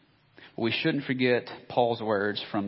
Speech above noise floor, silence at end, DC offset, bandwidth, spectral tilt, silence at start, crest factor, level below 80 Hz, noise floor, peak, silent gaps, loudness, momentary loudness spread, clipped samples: 28 dB; 0 s; under 0.1%; 5.8 kHz; -10 dB/octave; 0.4 s; 20 dB; -68 dBFS; -55 dBFS; -10 dBFS; none; -28 LUFS; 6 LU; under 0.1%